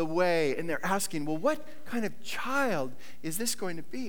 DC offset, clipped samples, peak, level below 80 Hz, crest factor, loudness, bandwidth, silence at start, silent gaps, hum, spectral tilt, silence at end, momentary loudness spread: 2%; under 0.1%; -14 dBFS; -68 dBFS; 18 dB; -31 LUFS; over 20 kHz; 0 s; none; none; -4 dB/octave; 0 s; 10 LU